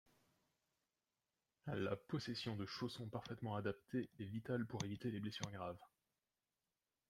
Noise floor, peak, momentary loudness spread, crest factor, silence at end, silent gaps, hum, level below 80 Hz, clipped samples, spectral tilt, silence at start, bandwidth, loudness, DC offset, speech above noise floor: under -90 dBFS; -28 dBFS; 6 LU; 20 dB; 1.25 s; none; none; -78 dBFS; under 0.1%; -6 dB/octave; 1.65 s; 15.5 kHz; -47 LUFS; under 0.1%; over 44 dB